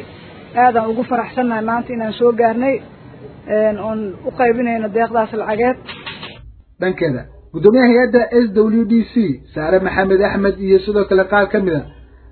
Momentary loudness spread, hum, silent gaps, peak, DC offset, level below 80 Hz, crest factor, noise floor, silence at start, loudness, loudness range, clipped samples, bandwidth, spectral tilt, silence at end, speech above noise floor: 11 LU; none; none; 0 dBFS; under 0.1%; -44 dBFS; 16 dB; -39 dBFS; 0 s; -16 LUFS; 5 LU; under 0.1%; 4.5 kHz; -10.5 dB/octave; 0.25 s; 24 dB